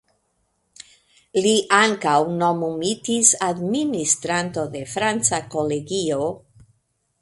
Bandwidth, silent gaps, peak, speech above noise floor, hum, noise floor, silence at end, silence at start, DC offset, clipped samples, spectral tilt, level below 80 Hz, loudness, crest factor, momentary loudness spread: 11.5 kHz; none; 0 dBFS; 49 dB; none; -69 dBFS; 0.85 s; 1.35 s; under 0.1%; under 0.1%; -3 dB/octave; -60 dBFS; -20 LUFS; 22 dB; 10 LU